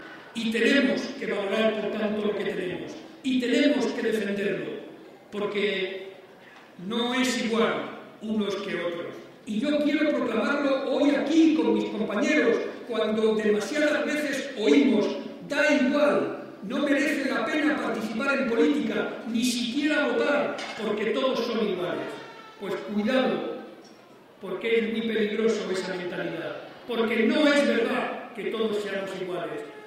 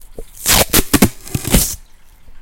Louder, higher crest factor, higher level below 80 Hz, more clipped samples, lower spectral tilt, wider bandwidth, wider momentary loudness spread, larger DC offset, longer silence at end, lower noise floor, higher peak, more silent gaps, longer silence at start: second, -26 LUFS vs -14 LUFS; about the same, 18 dB vs 16 dB; second, -70 dBFS vs -26 dBFS; second, under 0.1% vs 0.1%; first, -4.5 dB/octave vs -3 dB/octave; second, 15 kHz vs over 20 kHz; about the same, 13 LU vs 11 LU; neither; about the same, 0 s vs 0 s; first, -51 dBFS vs -40 dBFS; second, -8 dBFS vs 0 dBFS; neither; about the same, 0 s vs 0.05 s